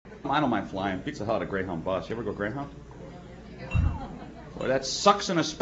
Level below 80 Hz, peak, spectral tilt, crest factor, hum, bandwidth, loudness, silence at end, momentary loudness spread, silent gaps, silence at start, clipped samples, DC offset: -42 dBFS; -4 dBFS; -5 dB/octave; 24 dB; none; 8.2 kHz; -28 LUFS; 0 s; 21 LU; none; 0.05 s; under 0.1%; under 0.1%